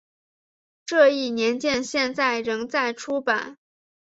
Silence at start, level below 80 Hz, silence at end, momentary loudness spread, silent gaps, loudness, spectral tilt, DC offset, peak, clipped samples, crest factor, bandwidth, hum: 0.85 s; -66 dBFS; 0.6 s; 8 LU; none; -23 LUFS; -2.5 dB/octave; under 0.1%; -4 dBFS; under 0.1%; 20 dB; 8 kHz; none